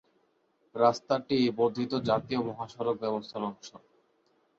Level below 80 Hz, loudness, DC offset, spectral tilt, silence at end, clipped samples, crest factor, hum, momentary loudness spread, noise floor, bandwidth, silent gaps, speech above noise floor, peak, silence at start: -68 dBFS; -30 LUFS; under 0.1%; -6 dB/octave; 0.8 s; under 0.1%; 22 dB; none; 11 LU; -71 dBFS; 7.6 kHz; none; 42 dB; -8 dBFS; 0.75 s